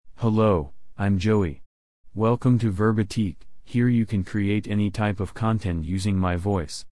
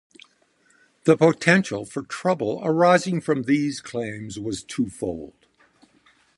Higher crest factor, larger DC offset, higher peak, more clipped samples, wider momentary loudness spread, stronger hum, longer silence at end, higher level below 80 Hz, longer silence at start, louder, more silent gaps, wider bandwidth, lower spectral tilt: second, 14 dB vs 22 dB; first, 0.9% vs under 0.1%; second, -10 dBFS vs -2 dBFS; neither; second, 7 LU vs 14 LU; neither; second, 0.05 s vs 1.1 s; first, -46 dBFS vs -58 dBFS; second, 0.1 s vs 1.05 s; about the same, -24 LUFS vs -22 LUFS; first, 1.66-2.04 s vs none; about the same, 12 kHz vs 11.5 kHz; first, -7.5 dB/octave vs -5.5 dB/octave